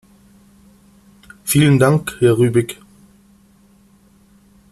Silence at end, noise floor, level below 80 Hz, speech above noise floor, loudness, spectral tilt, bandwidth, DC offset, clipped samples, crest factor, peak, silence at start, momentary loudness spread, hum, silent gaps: 2 s; -51 dBFS; -50 dBFS; 38 dB; -15 LUFS; -6 dB/octave; 14 kHz; under 0.1%; under 0.1%; 18 dB; -2 dBFS; 1.45 s; 17 LU; none; none